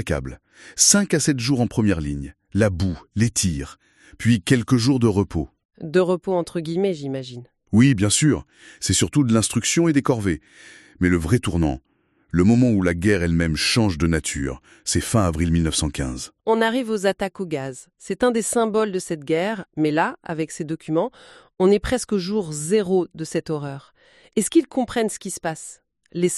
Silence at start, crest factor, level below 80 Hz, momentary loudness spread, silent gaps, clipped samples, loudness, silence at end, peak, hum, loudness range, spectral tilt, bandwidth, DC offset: 0 s; 20 dB; -40 dBFS; 12 LU; 5.65-5.69 s; under 0.1%; -21 LUFS; 0 s; -2 dBFS; none; 3 LU; -4.5 dB/octave; 13 kHz; under 0.1%